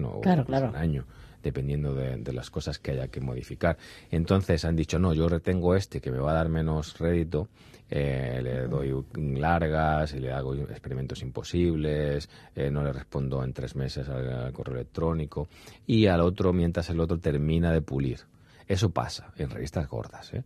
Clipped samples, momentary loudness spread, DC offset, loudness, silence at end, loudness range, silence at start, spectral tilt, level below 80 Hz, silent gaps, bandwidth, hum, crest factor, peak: under 0.1%; 10 LU; under 0.1%; -29 LUFS; 0 s; 5 LU; 0 s; -7.5 dB/octave; -42 dBFS; none; 13 kHz; none; 20 dB; -8 dBFS